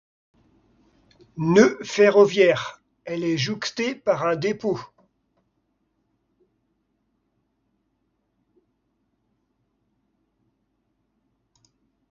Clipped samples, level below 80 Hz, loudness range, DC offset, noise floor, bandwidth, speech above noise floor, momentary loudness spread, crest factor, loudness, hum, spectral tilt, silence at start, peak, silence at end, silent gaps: under 0.1%; -66 dBFS; 11 LU; under 0.1%; -73 dBFS; 7.4 kHz; 53 dB; 16 LU; 24 dB; -21 LUFS; none; -5.5 dB/octave; 1.35 s; -2 dBFS; 7.25 s; none